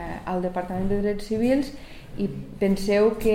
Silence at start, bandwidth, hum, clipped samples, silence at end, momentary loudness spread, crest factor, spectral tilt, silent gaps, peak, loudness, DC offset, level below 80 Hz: 0 s; 16 kHz; none; under 0.1%; 0 s; 11 LU; 16 dB; -7 dB/octave; none; -8 dBFS; -25 LUFS; 0.4%; -40 dBFS